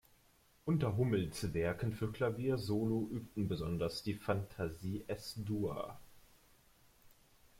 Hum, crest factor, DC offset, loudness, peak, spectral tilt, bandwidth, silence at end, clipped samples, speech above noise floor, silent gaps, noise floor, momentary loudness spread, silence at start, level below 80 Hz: none; 20 dB; under 0.1%; -38 LUFS; -20 dBFS; -7 dB/octave; 16.5 kHz; 0.5 s; under 0.1%; 32 dB; none; -69 dBFS; 8 LU; 0.65 s; -60 dBFS